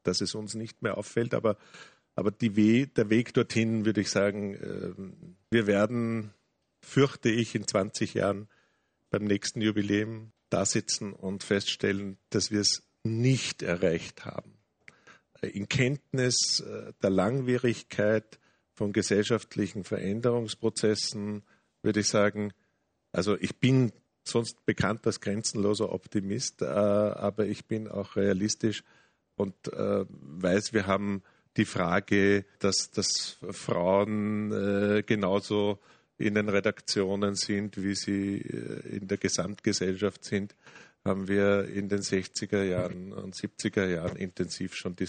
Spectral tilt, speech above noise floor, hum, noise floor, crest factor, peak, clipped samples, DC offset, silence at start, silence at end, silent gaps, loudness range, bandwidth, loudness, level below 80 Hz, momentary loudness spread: -4.5 dB/octave; 47 dB; none; -75 dBFS; 18 dB; -10 dBFS; under 0.1%; under 0.1%; 0.05 s; 0 s; none; 3 LU; 9.4 kHz; -29 LUFS; -64 dBFS; 11 LU